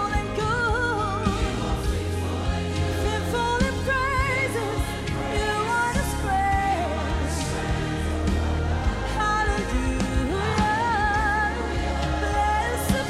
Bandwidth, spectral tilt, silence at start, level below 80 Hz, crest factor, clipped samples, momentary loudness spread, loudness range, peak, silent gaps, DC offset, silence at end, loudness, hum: 15 kHz; -5 dB/octave; 0 s; -32 dBFS; 18 dB; under 0.1%; 4 LU; 2 LU; -6 dBFS; none; under 0.1%; 0 s; -25 LUFS; none